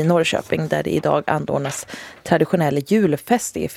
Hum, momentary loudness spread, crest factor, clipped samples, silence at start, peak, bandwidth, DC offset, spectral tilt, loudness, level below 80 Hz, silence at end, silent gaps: none; 8 LU; 18 dB; under 0.1%; 0 s; -2 dBFS; 16.5 kHz; under 0.1%; -5.5 dB/octave; -20 LUFS; -52 dBFS; 0 s; none